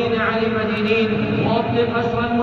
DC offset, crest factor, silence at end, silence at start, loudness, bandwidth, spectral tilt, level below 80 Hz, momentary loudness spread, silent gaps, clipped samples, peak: under 0.1%; 14 dB; 0 s; 0 s; -19 LUFS; 7 kHz; -8 dB/octave; -46 dBFS; 2 LU; none; under 0.1%; -6 dBFS